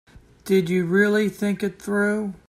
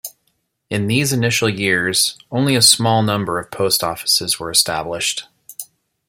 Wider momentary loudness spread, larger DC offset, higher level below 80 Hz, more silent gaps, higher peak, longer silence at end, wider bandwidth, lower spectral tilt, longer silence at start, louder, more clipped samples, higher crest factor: second, 7 LU vs 16 LU; neither; about the same, -56 dBFS vs -54 dBFS; neither; second, -8 dBFS vs 0 dBFS; second, 0.1 s vs 0.45 s; about the same, 15 kHz vs 16.5 kHz; first, -6.5 dB/octave vs -3 dB/octave; about the same, 0.15 s vs 0.05 s; second, -22 LUFS vs -16 LUFS; neither; about the same, 14 dB vs 18 dB